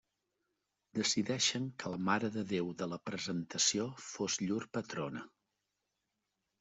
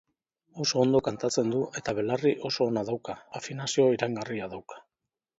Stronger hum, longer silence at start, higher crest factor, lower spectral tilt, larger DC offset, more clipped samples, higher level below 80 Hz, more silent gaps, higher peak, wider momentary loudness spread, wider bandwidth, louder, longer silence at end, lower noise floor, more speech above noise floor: neither; first, 0.95 s vs 0.55 s; about the same, 20 dB vs 20 dB; second, -3 dB/octave vs -4.5 dB/octave; neither; neither; second, -76 dBFS vs -62 dBFS; neither; second, -18 dBFS vs -10 dBFS; second, 10 LU vs 14 LU; about the same, 8.2 kHz vs 8 kHz; second, -36 LUFS vs -28 LUFS; first, 1.35 s vs 0.6 s; about the same, -86 dBFS vs -88 dBFS; second, 50 dB vs 60 dB